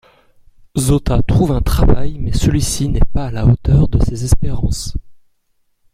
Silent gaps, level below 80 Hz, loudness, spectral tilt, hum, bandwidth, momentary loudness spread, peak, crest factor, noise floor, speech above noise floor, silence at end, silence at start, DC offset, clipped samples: none; -20 dBFS; -16 LUFS; -6.5 dB/octave; none; 15.5 kHz; 8 LU; 0 dBFS; 14 dB; -61 dBFS; 49 dB; 0.8 s; 0.75 s; under 0.1%; under 0.1%